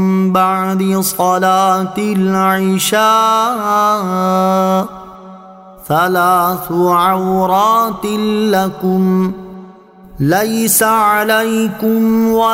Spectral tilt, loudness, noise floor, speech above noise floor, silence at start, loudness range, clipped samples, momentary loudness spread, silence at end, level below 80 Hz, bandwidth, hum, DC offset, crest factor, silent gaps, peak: -5 dB/octave; -13 LUFS; -38 dBFS; 26 dB; 0 s; 2 LU; under 0.1%; 5 LU; 0 s; -48 dBFS; 16.5 kHz; none; under 0.1%; 12 dB; none; 0 dBFS